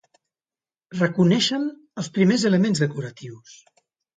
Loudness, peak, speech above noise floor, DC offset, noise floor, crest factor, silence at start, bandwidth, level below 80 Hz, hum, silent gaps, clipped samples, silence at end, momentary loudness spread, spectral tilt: -21 LUFS; -6 dBFS; over 69 dB; under 0.1%; under -90 dBFS; 18 dB; 0.9 s; 9.4 kHz; -66 dBFS; none; none; under 0.1%; 0.8 s; 17 LU; -5.5 dB/octave